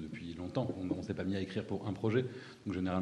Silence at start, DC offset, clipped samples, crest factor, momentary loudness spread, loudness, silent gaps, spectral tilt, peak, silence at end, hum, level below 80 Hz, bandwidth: 0 s; under 0.1%; under 0.1%; 18 dB; 9 LU; -38 LUFS; none; -7.5 dB/octave; -18 dBFS; 0 s; none; -64 dBFS; 11 kHz